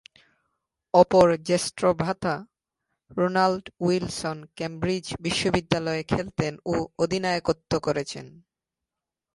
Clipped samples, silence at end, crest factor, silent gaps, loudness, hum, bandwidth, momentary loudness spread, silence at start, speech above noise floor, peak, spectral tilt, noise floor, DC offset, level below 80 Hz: under 0.1%; 1.05 s; 22 dB; none; -25 LUFS; none; 11.5 kHz; 11 LU; 0.95 s; 63 dB; -4 dBFS; -5 dB/octave; -87 dBFS; under 0.1%; -52 dBFS